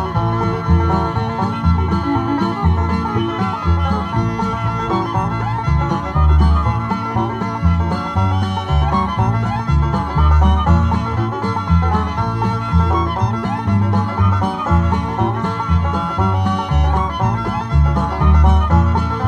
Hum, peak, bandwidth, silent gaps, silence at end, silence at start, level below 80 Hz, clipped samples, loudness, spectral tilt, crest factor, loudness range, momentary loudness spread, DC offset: none; -2 dBFS; 7.2 kHz; none; 0 s; 0 s; -20 dBFS; under 0.1%; -17 LUFS; -8 dB/octave; 14 dB; 2 LU; 6 LU; under 0.1%